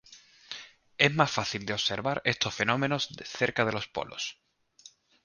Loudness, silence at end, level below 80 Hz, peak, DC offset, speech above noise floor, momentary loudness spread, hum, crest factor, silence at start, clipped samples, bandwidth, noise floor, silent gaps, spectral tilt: -29 LUFS; 0.35 s; -62 dBFS; -4 dBFS; under 0.1%; 28 dB; 17 LU; none; 26 dB; 0.1 s; under 0.1%; 10 kHz; -57 dBFS; none; -4 dB/octave